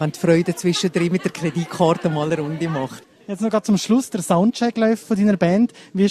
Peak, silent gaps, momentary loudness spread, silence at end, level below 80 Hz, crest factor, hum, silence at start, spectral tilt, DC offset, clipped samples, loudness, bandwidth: -2 dBFS; none; 7 LU; 0 s; -58 dBFS; 16 dB; none; 0 s; -6 dB/octave; under 0.1%; under 0.1%; -20 LUFS; 14 kHz